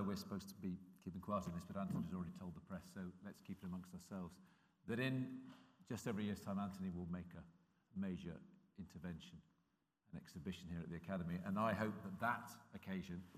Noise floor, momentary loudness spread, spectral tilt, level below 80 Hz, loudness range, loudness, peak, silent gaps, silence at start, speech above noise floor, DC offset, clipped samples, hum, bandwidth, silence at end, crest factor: -84 dBFS; 15 LU; -6.5 dB/octave; -76 dBFS; 7 LU; -47 LUFS; -26 dBFS; none; 0 s; 37 dB; under 0.1%; under 0.1%; none; 15.5 kHz; 0 s; 22 dB